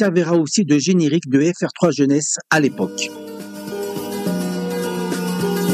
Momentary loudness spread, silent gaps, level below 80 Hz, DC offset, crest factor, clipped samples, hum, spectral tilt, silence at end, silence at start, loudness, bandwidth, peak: 10 LU; none; -64 dBFS; under 0.1%; 16 dB; under 0.1%; none; -5 dB/octave; 0 s; 0 s; -19 LUFS; 15.5 kHz; -2 dBFS